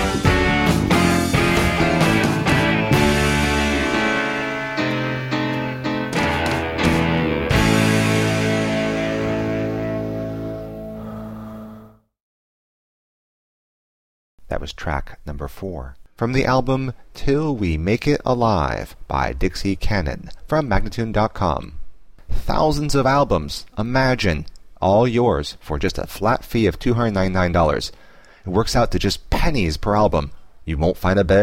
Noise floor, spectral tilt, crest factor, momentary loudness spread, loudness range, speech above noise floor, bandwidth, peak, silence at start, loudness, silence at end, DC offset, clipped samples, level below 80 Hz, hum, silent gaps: -44 dBFS; -5.5 dB/octave; 18 dB; 14 LU; 14 LU; 25 dB; 16.5 kHz; -2 dBFS; 0 s; -20 LUFS; 0 s; under 0.1%; under 0.1%; -30 dBFS; none; 12.20-14.38 s